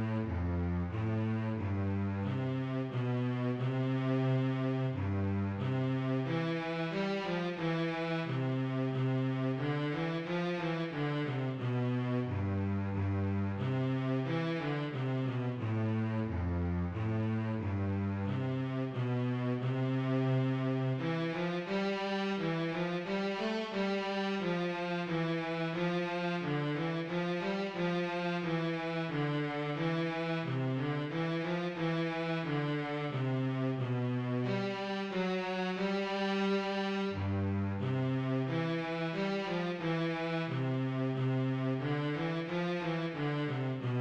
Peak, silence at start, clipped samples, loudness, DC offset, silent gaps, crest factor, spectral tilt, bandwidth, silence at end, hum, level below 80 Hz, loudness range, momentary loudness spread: -22 dBFS; 0 s; under 0.1%; -34 LUFS; under 0.1%; none; 12 dB; -8 dB/octave; 7.4 kHz; 0 s; none; -60 dBFS; 1 LU; 2 LU